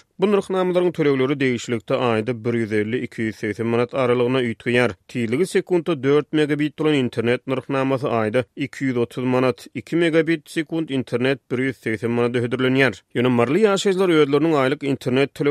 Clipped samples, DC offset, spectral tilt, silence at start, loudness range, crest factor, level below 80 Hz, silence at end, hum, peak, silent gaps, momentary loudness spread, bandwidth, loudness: under 0.1%; under 0.1%; -6.5 dB/octave; 0.2 s; 3 LU; 18 dB; -62 dBFS; 0 s; none; -2 dBFS; none; 7 LU; 13.5 kHz; -21 LUFS